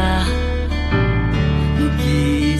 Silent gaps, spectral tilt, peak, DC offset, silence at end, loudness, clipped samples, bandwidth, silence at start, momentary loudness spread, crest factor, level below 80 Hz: none; -6.5 dB/octave; -4 dBFS; under 0.1%; 0 s; -18 LUFS; under 0.1%; 12.5 kHz; 0 s; 4 LU; 14 dB; -22 dBFS